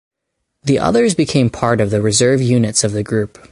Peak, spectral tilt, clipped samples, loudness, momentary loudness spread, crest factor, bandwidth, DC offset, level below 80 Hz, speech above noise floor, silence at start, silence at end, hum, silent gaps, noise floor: 0 dBFS; -5 dB/octave; under 0.1%; -15 LUFS; 6 LU; 14 dB; 11.5 kHz; under 0.1%; -44 dBFS; 59 dB; 0.65 s; 0.25 s; none; none; -74 dBFS